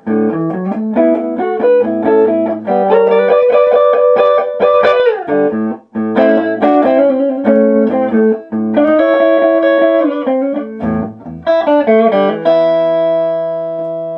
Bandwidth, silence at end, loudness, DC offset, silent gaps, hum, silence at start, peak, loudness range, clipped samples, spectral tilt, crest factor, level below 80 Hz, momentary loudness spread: 5.6 kHz; 0 s; -12 LUFS; under 0.1%; none; none; 0.05 s; 0 dBFS; 2 LU; under 0.1%; -8.5 dB/octave; 12 dB; -52 dBFS; 8 LU